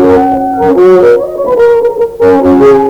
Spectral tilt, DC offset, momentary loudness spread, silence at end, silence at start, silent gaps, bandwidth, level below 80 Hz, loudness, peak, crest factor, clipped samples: -7.5 dB/octave; under 0.1%; 6 LU; 0 s; 0 s; none; 9 kHz; -36 dBFS; -7 LUFS; 0 dBFS; 6 dB; 0.9%